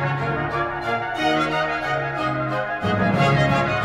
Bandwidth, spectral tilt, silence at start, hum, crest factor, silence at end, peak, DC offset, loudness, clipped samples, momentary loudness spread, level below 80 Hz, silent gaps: 12 kHz; -6.5 dB/octave; 0 s; none; 14 dB; 0 s; -8 dBFS; under 0.1%; -22 LUFS; under 0.1%; 6 LU; -46 dBFS; none